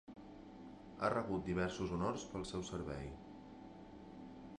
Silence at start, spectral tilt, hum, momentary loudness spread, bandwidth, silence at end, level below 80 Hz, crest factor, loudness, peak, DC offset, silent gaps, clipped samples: 0.05 s; -6 dB/octave; 50 Hz at -65 dBFS; 17 LU; 11 kHz; 0.05 s; -60 dBFS; 22 dB; -41 LUFS; -22 dBFS; under 0.1%; none; under 0.1%